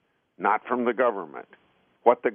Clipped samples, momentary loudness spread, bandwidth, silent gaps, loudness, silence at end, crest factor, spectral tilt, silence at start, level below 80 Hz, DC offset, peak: under 0.1%; 15 LU; 3.6 kHz; none; -25 LUFS; 0 s; 22 dB; -3.5 dB/octave; 0.4 s; -80 dBFS; under 0.1%; -4 dBFS